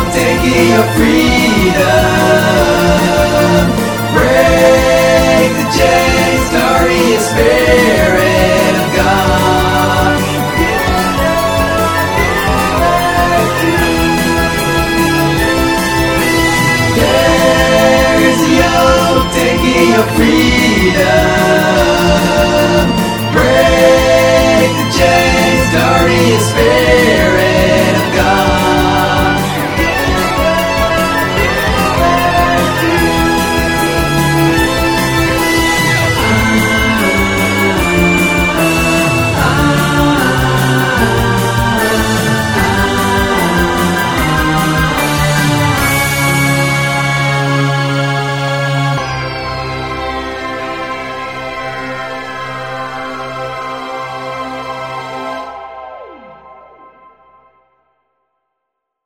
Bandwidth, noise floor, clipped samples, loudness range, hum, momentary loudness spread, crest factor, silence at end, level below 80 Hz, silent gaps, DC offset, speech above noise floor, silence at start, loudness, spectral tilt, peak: over 20 kHz; -74 dBFS; under 0.1%; 11 LU; none; 11 LU; 10 dB; 2.5 s; -24 dBFS; none; under 0.1%; 65 dB; 0 s; -10 LUFS; -4.5 dB/octave; 0 dBFS